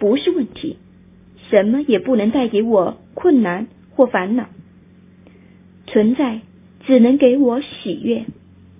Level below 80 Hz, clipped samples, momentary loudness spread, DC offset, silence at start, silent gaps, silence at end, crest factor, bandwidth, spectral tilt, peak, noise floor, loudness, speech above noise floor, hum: -56 dBFS; under 0.1%; 14 LU; under 0.1%; 0 s; none; 0.45 s; 18 dB; 3.8 kHz; -10.5 dB/octave; 0 dBFS; -46 dBFS; -17 LUFS; 31 dB; none